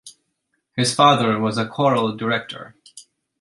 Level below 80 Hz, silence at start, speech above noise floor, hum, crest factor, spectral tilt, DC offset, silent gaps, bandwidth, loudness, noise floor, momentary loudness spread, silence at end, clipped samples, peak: -62 dBFS; 0.05 s; 54 dB; none; 20 dB; -4.5 dB/octave; under 0.1%; none; 11.5 kHz; -19 LUFS; -73 dBFS; 19 LU; 0.4 s; under 0.1%; -2 dBFS